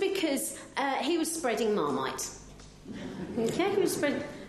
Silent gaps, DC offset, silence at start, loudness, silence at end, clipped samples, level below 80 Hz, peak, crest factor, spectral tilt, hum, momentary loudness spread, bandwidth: none; under 0.1%; 0 s; -30 LUFS; 0 s; under 0.1%; -60 dBFS; -14 dBFS; 16 dB; -3.5 dB/octave; none; 15 LU; 13 kHz